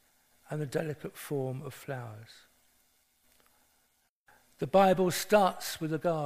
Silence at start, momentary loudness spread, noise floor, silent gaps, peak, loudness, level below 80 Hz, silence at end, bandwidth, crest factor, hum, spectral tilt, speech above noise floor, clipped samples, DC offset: 0.5 s; 16 LU; -73 dBFS; 4.09-4.26 s; -10 dBFS; -30 LUFS; -66 dBFS; 0 s; 15.5 kHz; 22 dB; none; -5 dB/octave; 44 dB; under 0.1%; under 0.1%